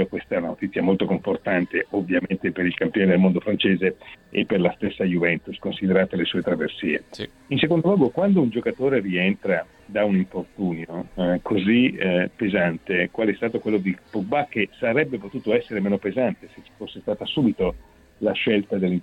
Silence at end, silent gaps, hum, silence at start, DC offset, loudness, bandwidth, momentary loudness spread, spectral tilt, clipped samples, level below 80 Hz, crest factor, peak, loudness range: 0 s; none; none; 0 s; under 0.1%; -23 LUFS; 5.6 kHz; 9 LU; -8 dB/octave; under 0.1%; -52 dBFS; 18 dB; -4 dBFS; 3 LU